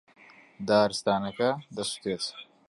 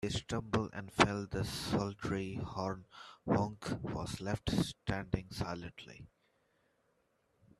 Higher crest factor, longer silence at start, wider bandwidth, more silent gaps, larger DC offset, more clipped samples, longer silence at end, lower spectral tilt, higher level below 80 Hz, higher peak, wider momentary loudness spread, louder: second, 20 dB vs 30 dB; first, 0.6 s vs 0 s; second, 11.5 kHz vs 14 kHz; neither; neither; neither; second, 0.25 s vs 1.55 s; second, -4 dB/octave vs -5.5 dB/octave; second, -66 dBFS vs -56 dBFS; about the same, -10 dBFS vs -8 dBFS; second, 10 LU vs 16 LU; first, -28 LUFS vs -37 LUFS